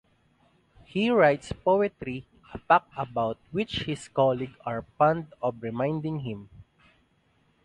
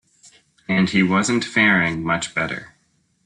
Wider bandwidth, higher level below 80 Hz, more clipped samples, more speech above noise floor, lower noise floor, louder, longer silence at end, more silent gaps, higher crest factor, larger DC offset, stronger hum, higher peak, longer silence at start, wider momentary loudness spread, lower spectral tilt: about the same, 11 kHz vs 10.5 kHz; about the same, -56 dBFS vs -54 dBFS; neither; first, 40 dB vs 34 dB; first, -67 dBFS vs -53 dBFS; second, -27 LUFS vs -19 LUFS; first, 1.05 s vs 0.6 s; neither; about the same, 22 dB vs 18 dB; neither; neither; about the same, -6 dBFS vs -4 dBFS; first, 0.95 s vs 0.7 s; first, 14 LU vs 11 LU; first, -6.5 dB/octave vs -4.5 dB/octave